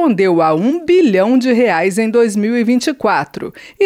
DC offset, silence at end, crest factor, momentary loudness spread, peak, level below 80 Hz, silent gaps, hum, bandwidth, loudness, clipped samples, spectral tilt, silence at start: under 0.1%; 0 s; 10 dB; 6 LU; -2 dBFS; -56 dBFS; none; none; 15 kHz; -13 LUFS; under 0.1%; -5.5 dB/octave; 0 s